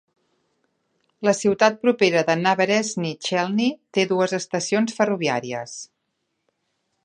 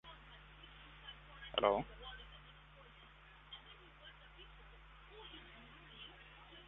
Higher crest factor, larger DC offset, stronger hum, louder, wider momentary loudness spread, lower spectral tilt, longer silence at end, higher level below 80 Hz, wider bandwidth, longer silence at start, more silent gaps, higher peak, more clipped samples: second, 20 dB vs 30 dB; neither; second, none vs 50 Hz at -65 dBFS; first, -21 LUFS vs -44 LUFS; second, 8 LU vs 23 LU; first, -4.5 dB/octave vs -2 dB/octave; first, 1.2 s vs 0 s; second, -70 dBFS vs -62 dBFS; first, 10.5 kHz vs 4.1 kHz; first, 1.2 s vs 0.05 s; neither; first, -2 dBFS vs -18 dBFS; neither